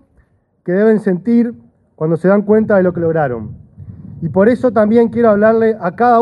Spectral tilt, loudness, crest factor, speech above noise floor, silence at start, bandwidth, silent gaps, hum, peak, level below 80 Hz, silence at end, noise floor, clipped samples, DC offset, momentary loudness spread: -10 dB/octave; -13 LUFS; 14 dB; 43 dB; 0.65 s; 5.2 kHz; none; none; 0 dBFS; -50 dBFS; 0 s; -55 dBFS; under 0.1%; under 0.1%; 11 LU